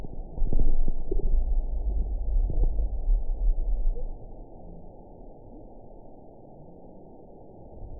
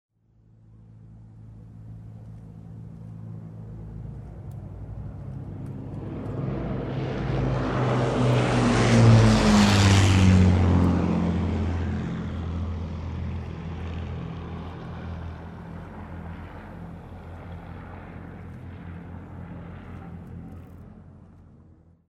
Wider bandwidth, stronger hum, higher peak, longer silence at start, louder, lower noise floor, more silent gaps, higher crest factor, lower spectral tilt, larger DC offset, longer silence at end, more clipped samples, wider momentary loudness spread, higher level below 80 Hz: second, 1 kHz vs 12 kHz; neither; second, -10 dBFS vs -6 dBFS; second, 0 s vs 0.9 s; second, -32 LUFS vs -23 LUFS; second, -48 dBFS vs -58 dBFS; neither; second, 14 dB vs 20 dB; first, -16 dB/octave vs -6.5 dB/octave; first, 0.3% vs under 0.1%; second, 0 s vs 0.65 s; neither; second, 19 LU vs 24 LU; first, -26 dBFS vs -40 dBFS